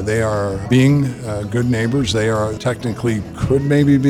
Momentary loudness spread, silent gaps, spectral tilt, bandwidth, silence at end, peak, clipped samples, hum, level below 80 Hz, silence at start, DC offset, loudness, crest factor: 8 LU; none; -6.5 dB/octave; 13 kHz; 0 s; -2 dBFS; under 0.1%; none; -38 dBFS; 0 s; under 0.1%; -17 LUFS; 14 dB